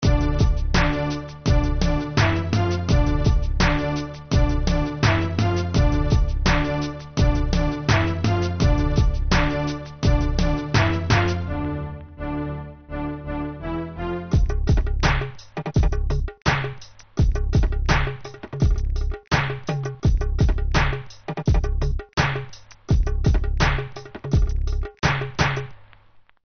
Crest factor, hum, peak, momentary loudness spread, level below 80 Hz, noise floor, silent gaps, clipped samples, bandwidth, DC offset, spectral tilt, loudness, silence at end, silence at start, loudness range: 16 dB; none; -4 dBFS; 9 LU; -24 dBFS; -52 dBFS; none; under 0.1%; 6.6 kHz; under 0.1%; -5.5 dB/octave; -23 LUFS; 0.6 s; 0 s; 3 LU